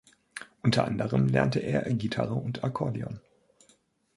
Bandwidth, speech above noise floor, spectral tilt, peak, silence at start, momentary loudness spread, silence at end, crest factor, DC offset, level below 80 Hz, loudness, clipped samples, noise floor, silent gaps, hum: 11.5 kHz; 39 dB; -7 dB/octave; -8 dBFS; 0.35 s; 18 LU; 0.95 s; 22 dB; under 0.1%; -58 dBFS; -28 LUFS; under 0.1%; -66 dBFS; none; none